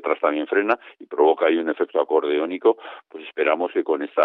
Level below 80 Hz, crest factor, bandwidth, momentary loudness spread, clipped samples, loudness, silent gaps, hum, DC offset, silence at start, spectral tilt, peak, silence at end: -82 dBFS; 18 dB; 4.4 kHz; 11 LU; under 0.1%; -22 LUFS; none; none; under 0.1%; 0.05 s; -7 dB/octave; -4 dBFS; 0 s